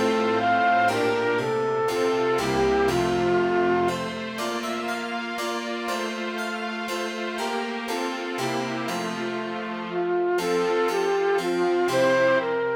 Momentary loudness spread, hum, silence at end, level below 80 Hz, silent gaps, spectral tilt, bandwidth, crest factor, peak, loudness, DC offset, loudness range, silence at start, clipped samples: 8 LU; none; 0 s; -54 dBFS; none; -4.5 dB/octave; over 20 kHz; 14 dB; -10 dBFS; -24 LUFS; under 0.1%; 6 LU; 0 s; under 0.1%